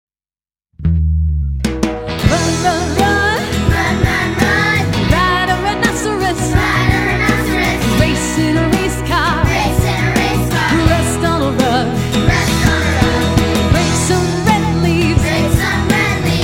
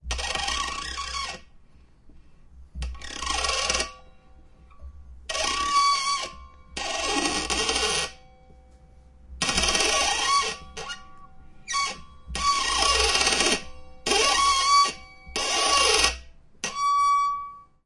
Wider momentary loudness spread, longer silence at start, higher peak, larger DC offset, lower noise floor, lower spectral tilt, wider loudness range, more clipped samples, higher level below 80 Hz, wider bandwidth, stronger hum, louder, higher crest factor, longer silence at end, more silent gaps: second, 3 LU vs 17 LU; first, 0.8 s vs 0.05 s; first, 0 dBFS vs -4 dBFS; neither; first, under -90 dBFS vs -52 dBFS; first, -5 dB/octave vs -0.5 dB/octave; second, 2 LU vs 9 LU; neither; first, -24 dBFS vs -42 dBFS; first, 16.5 kHz vs 11.5 kHz; neither; first, -14 LUFS vs -23 LUFS; second, 14 dB vs 22 dB; second, 0 s vs 0.25 s; neither